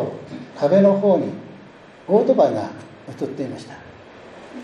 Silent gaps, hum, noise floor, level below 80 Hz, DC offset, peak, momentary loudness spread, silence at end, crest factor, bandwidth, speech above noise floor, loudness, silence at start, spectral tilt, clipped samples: none; none; -44 dBFS; -66 dBFS; under 0.1%; -4 dBFS; 24 LU; 0 s; 18 dB; 9.4 kHz; 25 dB; -19 LUFS; 0 s; -8 dB/octave; under 0.1%